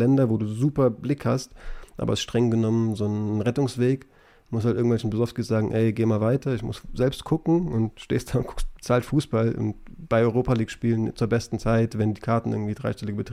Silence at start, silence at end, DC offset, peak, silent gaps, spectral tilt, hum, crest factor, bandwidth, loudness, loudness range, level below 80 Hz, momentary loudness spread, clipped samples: 0 s; 0 s; under 0.1%; -10 dBFS; none; -7.5 dB/octave; none; 14 dB; 14 kHz; -25 LUFS; 1 LU; -42 dBFS; 8 LU; under 0.1%